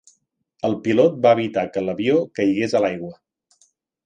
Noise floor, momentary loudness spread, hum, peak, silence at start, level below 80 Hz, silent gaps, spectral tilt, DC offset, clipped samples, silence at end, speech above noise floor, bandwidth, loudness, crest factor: -66 dBFS; 9 LU; none; -2 dBFS; 0.65 s; -62 dBFS; none; -6.5 dB/octave; under 0.1%; under 0.1%; 0.95 s; 47 dB; 9.2 kHz; -20 LUFS; 18 dB